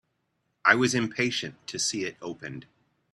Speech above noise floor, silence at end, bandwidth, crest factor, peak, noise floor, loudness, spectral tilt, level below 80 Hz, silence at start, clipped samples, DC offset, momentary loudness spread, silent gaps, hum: 48 dB; 0.5 s; 13 kHz; 26 dB; -4 dBFS; -76 dBFS; -26 LUFS; -3 dB/octave; -68 dBFS; 0.65 s; under 0.1%; under 0.1%; 17 LU; none; none